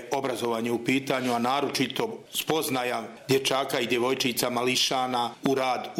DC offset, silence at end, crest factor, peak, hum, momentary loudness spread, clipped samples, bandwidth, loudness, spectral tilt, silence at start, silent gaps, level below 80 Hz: under 0.1%; 0 s; 20 dB; -6 dBFS; none; 5 LU; under 0.1%; 17 kHz; -26 LUFS; -3.5 dB/octave; 0 s; none; -70 dBFS